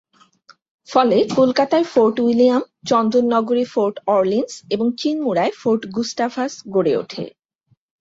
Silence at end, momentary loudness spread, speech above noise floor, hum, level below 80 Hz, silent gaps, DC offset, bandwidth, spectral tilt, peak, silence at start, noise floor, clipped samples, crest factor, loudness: 0.7 s; 7 LU; 46 dB; none; -64 dBFS; none; under 0.1%; 7.8 kHz; -5.5 dB/octave; -2 dBFS; 0.9 s; -63 dBFS; under 0.1%; 16 dB; -18 LUFS